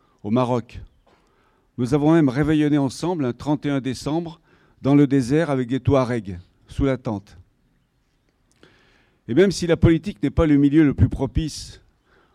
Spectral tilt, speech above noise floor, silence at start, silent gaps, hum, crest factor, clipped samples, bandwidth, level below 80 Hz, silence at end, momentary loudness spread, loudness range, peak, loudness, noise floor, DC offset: -7.5 dB/octave; 46 dB; 0.25 s; none; none; 16 dB; under 0.1%; 11.5 kHz; -38 dBFS; 0.65 s; 13 LU; 6 LU; -4 dBFS; -20 LUFS; -65 dBFS; under 0.1%